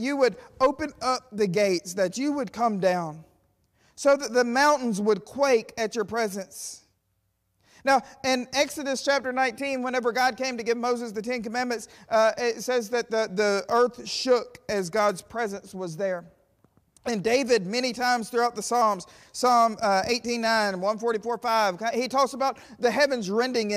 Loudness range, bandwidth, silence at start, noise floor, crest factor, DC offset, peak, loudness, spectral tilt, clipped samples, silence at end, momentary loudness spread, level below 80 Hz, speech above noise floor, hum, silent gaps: 4 LU; 15.5 kHz; 0 s; -74 dBFS; 14 dB; under 0.1%; -12 dBFS; -25 LUFS; -3.5 dB/octave; under 0.1%; 0 s; 8 LU; -64 dBFS; 48 dB; none; none